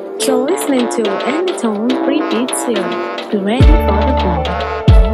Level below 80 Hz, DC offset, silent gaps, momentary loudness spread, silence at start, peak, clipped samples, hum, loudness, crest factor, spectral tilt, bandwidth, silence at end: -18 dBFS; under 0.1%; none; 7 LU; 0 s; 0 dBFS; under 0.1%; none; -15 LUFS; 12 dB; -6 dB/octave; 13.5 kHz; 0 s